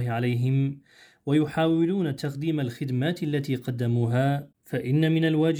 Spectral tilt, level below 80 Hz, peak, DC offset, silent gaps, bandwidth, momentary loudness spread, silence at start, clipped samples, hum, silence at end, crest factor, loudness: -8 dB/octave; -66 dBFS; -12 dBFS; under 0.1%; none; 19.5 kHz; 8 LU; 0 s; under 0.1%; none; 0 s; 12 dB; -26 LUFS